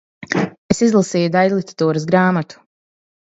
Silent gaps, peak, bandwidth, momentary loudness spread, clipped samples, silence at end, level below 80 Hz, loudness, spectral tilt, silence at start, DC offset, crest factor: 0.58-0.69 s; 0 dBFS; 8 kHz; 7 LU; under 0.1%; 0.8 s; -54 dBFS; -17 LUFS; -6 dB/octave; 0.2 s; under 0.1%; 18 dB